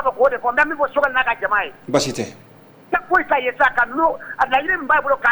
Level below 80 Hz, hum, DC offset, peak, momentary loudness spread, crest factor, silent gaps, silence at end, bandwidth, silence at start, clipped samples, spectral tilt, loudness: -48 dBFS; none; under 0.1%; -4 dBFS; 6 LU; 14 dB; none; 0 s; over 20 kHz; 0 s; under 0.1%; -3.5 dB/octave; -18 LUFS